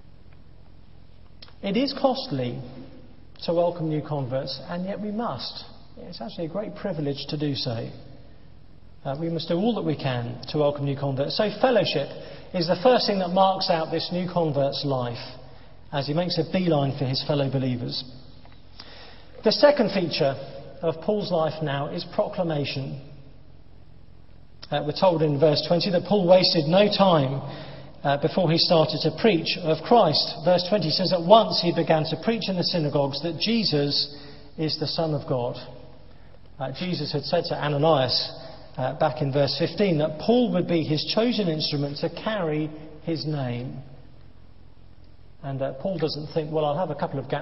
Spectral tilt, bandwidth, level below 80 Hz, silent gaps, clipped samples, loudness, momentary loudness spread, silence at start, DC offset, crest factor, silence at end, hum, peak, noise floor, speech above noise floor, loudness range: -8.5 dB/octave; 6 kHz; -56 dBFS; none; under 0.1%; -24 LUFS; 15 LU; 1.4 s; 0.6%; 24 dB; 0 s; none; -2 dBFS; -51 dBFS; 27 dB; 10 LU